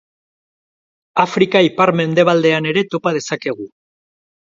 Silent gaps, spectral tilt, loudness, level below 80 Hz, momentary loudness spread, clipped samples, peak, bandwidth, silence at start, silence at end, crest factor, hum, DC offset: none; -5.5 dB/octave; -15 LUFS; -62 dBFS; 10 LU; under 0.1%; 0 dBFS; 7.8 kHz; 1.15 s; 0.9 s; 18 dB; none; under 0.1%